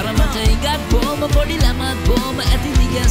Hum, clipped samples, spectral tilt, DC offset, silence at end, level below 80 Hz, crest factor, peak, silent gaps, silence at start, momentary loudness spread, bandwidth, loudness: none; under 0.1%; -5 dB/octave; under 0.1%; 0 s; -18 dBFS; 12 dB; -4 dBFS; none; 0 s; 2 LU; 16 kHz; -17 LUFS